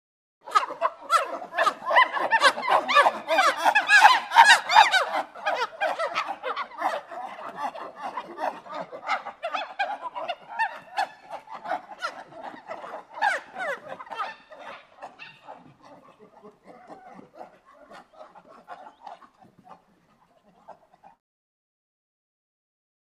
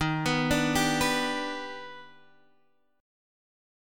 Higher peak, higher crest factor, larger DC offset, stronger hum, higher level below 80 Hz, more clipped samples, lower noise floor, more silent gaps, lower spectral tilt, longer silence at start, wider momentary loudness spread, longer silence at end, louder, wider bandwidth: first, 0 dBFS vs -12 dBFS; first, 26 dB vs 20 dB; neither; neither; second, -78 dBFS vs -50 dBFS; neither; second, -62 dBFS vs -70 dBFS; neither; second, 0 dB/octave vs -4 dB/octave; first, 0.45 s vs 0 s; first, 25 LU vs 17 LU; first, 2.3 s vs 1 s; first, -23 LUFS vs -27 LUFS; second, 15.5 kHz vs 17.5 kHz